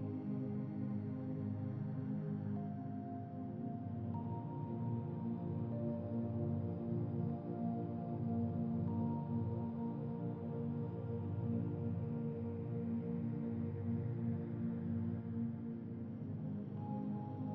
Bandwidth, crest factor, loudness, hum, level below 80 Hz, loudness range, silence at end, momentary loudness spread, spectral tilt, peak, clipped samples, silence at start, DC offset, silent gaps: 3.9 kHz; 14 dB; -42 LUFS; none; -74 dBFS; 3 LU; 0 s; 5 LU; -11.5 dB/octave; -28 dBFS; under 0.1%; 0 s; under 0.1%; none